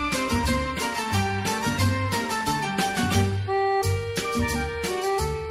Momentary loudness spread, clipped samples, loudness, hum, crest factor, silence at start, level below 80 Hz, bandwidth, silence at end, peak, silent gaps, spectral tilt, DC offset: 4 LU; under 0.1%; -25 LUFS; none; 16 dB; 0 s; -38 dBFS; 16 kHz; 0 s; -8 dBFS; none; -4.5 dB/octave; under 0.1%